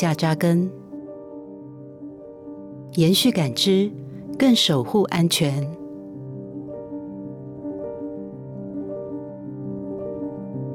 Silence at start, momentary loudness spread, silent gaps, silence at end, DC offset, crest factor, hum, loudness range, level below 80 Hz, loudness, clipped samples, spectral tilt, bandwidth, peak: 0 s; 20 LU; none; 0 s; under 0.1%; 16 dB; none; 13 LU; -60 dBFS; -22 LUFS; under 0.1%; -5 dB/octave; 17.5 kHz; -8 dBFS